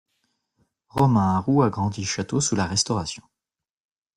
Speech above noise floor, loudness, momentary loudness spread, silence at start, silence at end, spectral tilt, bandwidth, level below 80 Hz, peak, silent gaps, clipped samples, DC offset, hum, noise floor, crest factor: 65 dB; -22 LUFS; 11 LU; 0.95 s; 0.95 s; -5 dB/octave; 12.5 kHz; -56 dBFS; -8 dBFS; none; under 0.1%; under 0.1%; none; -87 dBFS; 18 dB